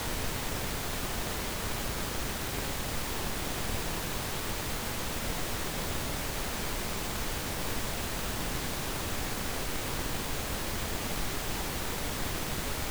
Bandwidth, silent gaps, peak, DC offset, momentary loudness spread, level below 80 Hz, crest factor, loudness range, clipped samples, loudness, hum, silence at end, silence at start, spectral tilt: over 20 kHz; none; -20 dBFS; under 0.1%; 0 LU; -40 dBFS; 14 dB; 0 LU; under 0.1%; -34 LUFS; none; 0 s; 0 s; -3 dB/octave